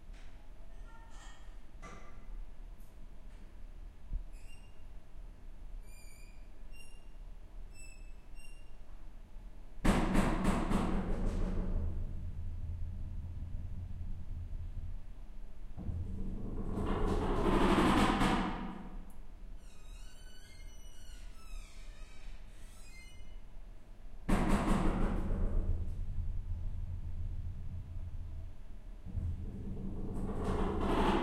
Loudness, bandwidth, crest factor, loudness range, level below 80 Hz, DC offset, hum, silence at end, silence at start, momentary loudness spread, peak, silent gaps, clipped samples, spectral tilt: -37 LUFS; 12.5 kHz; 22 dB; 21 LU; -40 dBFS; under 0.1%; none; 0 s; 0 s; 24 LU; -14 dBFS; none; under 0.1%; -6.5 dB/octave